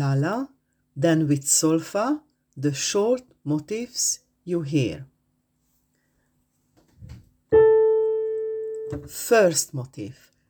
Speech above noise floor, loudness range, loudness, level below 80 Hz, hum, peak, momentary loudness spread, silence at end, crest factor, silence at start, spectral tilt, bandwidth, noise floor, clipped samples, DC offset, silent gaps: 47 dB; 7 LU; -23 LUFS; -56 dBFS; none; -6 dBFS; 15 LU; 0.4 s; 18 dB; 0 s; -4.5 dB/octave; over 20 kHz; -71 dBFS; under 0.1%; under 0.1%; none